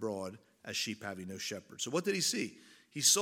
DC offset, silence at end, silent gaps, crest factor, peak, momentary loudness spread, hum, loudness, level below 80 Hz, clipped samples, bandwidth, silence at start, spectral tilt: under 0.1%; 0 s; none; 22 dB; -14 dBFS; 13 LU; none; -35 LUFS; -82 dBFS; under 0.1%; 17 kHz; 0 s; -2 dB/octave